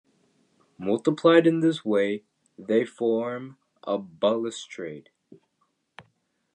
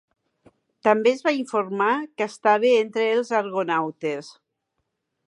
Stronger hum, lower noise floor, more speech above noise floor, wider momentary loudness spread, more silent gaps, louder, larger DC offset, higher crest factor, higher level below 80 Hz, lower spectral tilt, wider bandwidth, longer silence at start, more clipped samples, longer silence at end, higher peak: neither; second, -73 dBFS vs -78 dBFS; second, 49 dB vs 56 dB; first, 19 LU vs 9 LU; neither; second, -25 LUFS vs -22 LUFS; neither; about the same, 22 dB vs 20 dB; about the same, -76 dBFS vs -80 dBFS; about the same, -6 dB/octave vs -5 dB/octave; second, 9.8 kHz vs 11 kHz; about the same, 0.8 s vs 0.85 s; neither; second, 0.55 s vs 0.95 s; about the same, -4 dBFS vs -4 dBFS